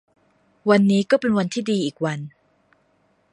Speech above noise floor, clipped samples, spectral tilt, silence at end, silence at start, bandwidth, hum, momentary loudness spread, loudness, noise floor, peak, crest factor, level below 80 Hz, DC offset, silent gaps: 44 dB; under 0.1%; -6 dB/octave; 1.05 s; 0.65 s; 11 kHz; none; 11 LU; -20 LUFS; -64 dBFS; -2 dBFS; 20 dB; -64 dBFS; under 0.1%; none